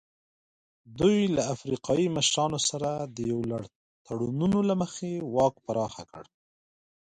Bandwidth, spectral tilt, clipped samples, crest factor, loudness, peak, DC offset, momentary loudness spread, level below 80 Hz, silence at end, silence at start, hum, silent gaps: 9.6 kHz; -4.5 dB/octave; under 0.1%; 18 dB; -28 LUFS; -10 dBFS; under 0.1%; 11 LU; -58 dBFS; 0.9 s; 0.9 s; none; 3.75-4.05 s